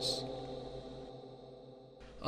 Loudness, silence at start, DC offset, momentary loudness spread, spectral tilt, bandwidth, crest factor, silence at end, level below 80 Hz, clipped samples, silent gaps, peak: -44 LUFS; 0 s; under 0.1%; 16 LU; -4 dB/octave; 14.5 kHz; 24 dB; 0 s; -60 dBFS; under 0.1%; none; -18 dBFS